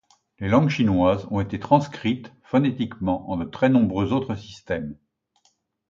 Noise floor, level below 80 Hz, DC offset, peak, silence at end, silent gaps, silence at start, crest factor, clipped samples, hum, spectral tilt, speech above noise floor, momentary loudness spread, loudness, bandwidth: -67 dBFS; -46 dBFS; under 0.1%; -4 dBFS; 0.95 s; none; 0.4 s; 18 dB; under 0.1%; none; -8 dB/octave; 45 dB; 11 LU; -23 LUFS; 7.4 kHz